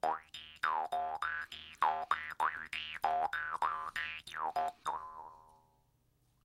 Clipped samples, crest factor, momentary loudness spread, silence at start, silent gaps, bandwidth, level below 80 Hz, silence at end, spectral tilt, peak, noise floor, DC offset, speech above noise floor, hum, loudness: under 0.1%; 22 dB; 9 LU; 0.05 s; none; 16 kHz; -70 dBFS; 0.95 s; -2 dB/octave; -16 dBFS; -74 dBFS; under 0.1%; 36 dB; none; -37 LUFS